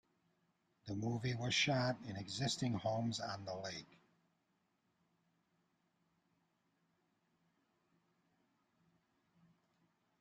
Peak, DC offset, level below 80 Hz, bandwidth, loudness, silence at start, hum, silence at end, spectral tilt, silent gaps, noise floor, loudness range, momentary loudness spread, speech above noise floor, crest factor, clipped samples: -22 dBFS; under 0.1%; -76 dBFS; 11 kHz; -40 LUFS; 0.85 s; none; 6.25 s; -4.5 dB/octave; none; -82 dBFS; 14 LU; 13 LU; 42 dB; 22 dB; under 0.1%